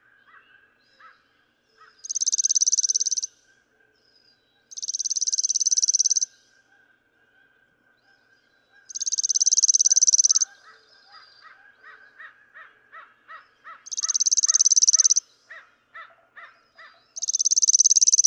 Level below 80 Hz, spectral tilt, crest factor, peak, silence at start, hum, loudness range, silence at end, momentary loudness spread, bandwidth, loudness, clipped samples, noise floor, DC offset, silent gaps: -86 dBFS; 6.5 dB/octave; 18 dB; -6 dBFS; 2.05 s; none; 7 LU; 0 s; 15 LU; 10.5 kHz; -18 LUFS; under 0.1%; -66 dBFS; under 0.1%; none